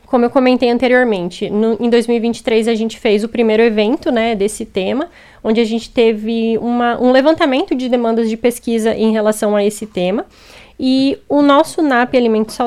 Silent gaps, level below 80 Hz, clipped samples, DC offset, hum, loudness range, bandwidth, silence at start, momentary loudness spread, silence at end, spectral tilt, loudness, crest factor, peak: none; -46 dBFS; under 0.1%; under 0.1%; none; 2 LU; 14 kHz; 0.1 s; 7 LU; 0 s; -5 dB/octave; -14 LUFS; 14 dB; 0 dBFS